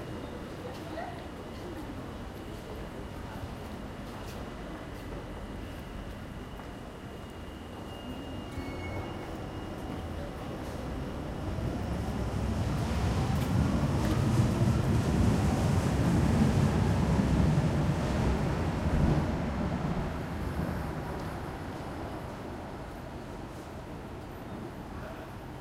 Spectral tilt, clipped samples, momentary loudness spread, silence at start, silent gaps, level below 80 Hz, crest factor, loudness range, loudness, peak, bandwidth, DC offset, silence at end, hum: -7 dB/octave; under 0.1%; 15 LU; 0 s; none; -40 dBFS; 18 dB; 14 LU; -33 LUFS; -12 dBFS; 16 kHz; under 0.1%; 0 s; none